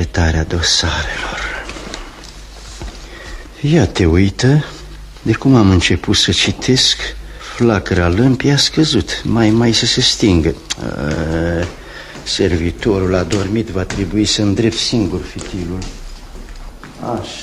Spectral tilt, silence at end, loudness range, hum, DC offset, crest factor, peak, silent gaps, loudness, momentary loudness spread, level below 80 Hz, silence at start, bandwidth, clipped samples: -4.5 dB/octave; 0 s; 6 LU; none; under 0.1%; 16 dB; 0 dBFS; none; -14 LUFS; 20 LU; -30 dBFS; 0 s; 13 kHz; under 0.1%